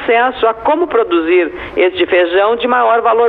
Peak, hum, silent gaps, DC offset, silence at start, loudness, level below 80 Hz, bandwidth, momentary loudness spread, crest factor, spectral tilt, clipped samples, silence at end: -2 dBFS; none; none; under 0.1%; 0 s; -12 LUFS; -46 dBFS; 4.4 kHz; 4 LU; 10 dB; -7 dB/octave; under 0.1%; 0 s